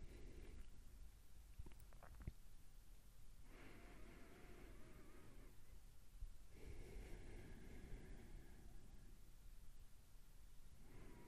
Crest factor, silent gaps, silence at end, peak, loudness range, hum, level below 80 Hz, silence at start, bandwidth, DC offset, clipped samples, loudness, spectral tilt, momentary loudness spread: 20 dB; none; 0 s; -38 dBFS; 3 LU; none; -60 dBFS; 0 s; 15 kHz; under 0.1%; under 0.1%; -64 LUFS; -5.5 dB/octave; 9 LU